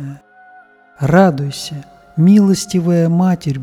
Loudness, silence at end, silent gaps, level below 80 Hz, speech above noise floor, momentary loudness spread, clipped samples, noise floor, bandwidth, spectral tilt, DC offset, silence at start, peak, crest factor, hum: -13 LUFS; 0 s; none; -48 dBFS; 32 dB; 16 LU; under 0.1%; -45 dBFS; 14 kHz; -7 dB/octave; under 0.1%; 0 s; 0 dBFS; 14 dB; none